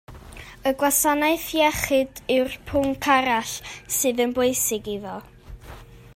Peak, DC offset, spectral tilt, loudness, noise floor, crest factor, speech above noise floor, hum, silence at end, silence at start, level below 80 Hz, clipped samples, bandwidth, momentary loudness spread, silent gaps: -6 dBFS; under 0.1%; -2.5 dB/octave; -22 LUFS; -43 dBFS; 18 dB; 20 dB; none; 0.1 s; 0.1 s; -48 dBFS; under 0.1%; 16 kHz; 19 LU; none